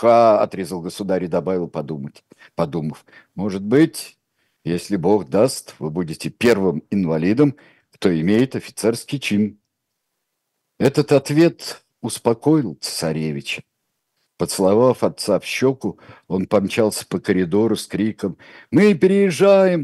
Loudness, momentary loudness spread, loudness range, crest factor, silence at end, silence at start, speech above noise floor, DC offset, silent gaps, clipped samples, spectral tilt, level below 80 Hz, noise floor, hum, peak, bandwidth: -19 LUFS; 13 LU; 4 LU; 16 dB; 0 s; 0 s; 58 dB; under 0.1%; none; under 0.1%; -6 dB/octave; -58 dBFS; -76 dBFS; none; -2 dBFS; 14 kHz